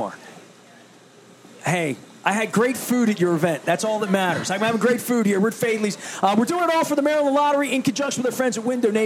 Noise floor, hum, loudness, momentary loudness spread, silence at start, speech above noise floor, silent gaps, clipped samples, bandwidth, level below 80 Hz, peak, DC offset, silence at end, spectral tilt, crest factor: -49 dBFS; none; -21 LUFS; 5 LU; 0 s; 28 dB; none; under 0.1%; 16.5 kHz; -72 dBFS; -2 dBFS; under 0.1%; 0 s; -4.5 dB/octave; 18 dB